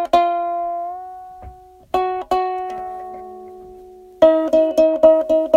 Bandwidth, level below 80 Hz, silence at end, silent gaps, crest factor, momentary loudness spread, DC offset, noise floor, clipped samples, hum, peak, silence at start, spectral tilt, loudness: 12.5 kHz; -50 dBFS; 0 s; none; 18 dB; 23 LU; under 0.1%; -41 dBFS; under 0.1%; none; 0 dBFS; 0 s; -5.5 dB/octave; -17 LUFS